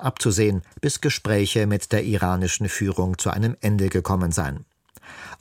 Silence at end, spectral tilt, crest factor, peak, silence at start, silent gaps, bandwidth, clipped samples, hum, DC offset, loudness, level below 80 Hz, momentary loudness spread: 0.05 s; -5 dB/octave; 18 dB; -6 dBFS; 0 s; none; 16.5 kHz; under 0.1%; none; under 0.1%; -23 LUFS; -44 dBFS; 5 LU